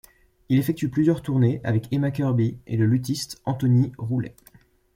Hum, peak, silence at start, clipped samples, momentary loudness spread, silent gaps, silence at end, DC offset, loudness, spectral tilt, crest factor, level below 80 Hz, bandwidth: none; -8 dBFS; 0.5 s; under 0.1%; 7 LU; none; 0.65 s; under 0.1%; -23 LUFS; -7.5 dB/octave; 16 dB; -54 dBFS; 16.5 kHz